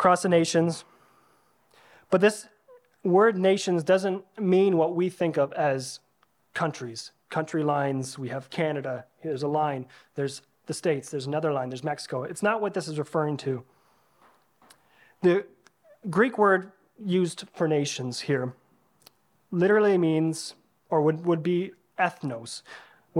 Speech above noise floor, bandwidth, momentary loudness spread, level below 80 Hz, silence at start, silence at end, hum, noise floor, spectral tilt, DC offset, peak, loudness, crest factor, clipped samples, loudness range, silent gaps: 42 dB; 13.5 kHz; 15 LU; -76 dBFS; 0 s; 0 s; none; -67 dBFS; -5.5 dB/octave; under 0.1%; -6 dBFS; -26 LUFS; 22 dB; under 0.1%; 6 LU; none